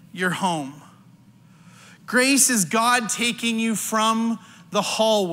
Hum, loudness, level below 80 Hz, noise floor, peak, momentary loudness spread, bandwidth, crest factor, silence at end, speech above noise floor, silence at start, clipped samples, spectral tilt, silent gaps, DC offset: none; -21 LUFS; -72 dBFS; -51 dBFS; -4 dBFS; 11 LU; 16 kHz; 18 dB; 0 s; 30 dB; 0.15 s; under 0.1%; -2.5 dB/octave; none; under 0.1%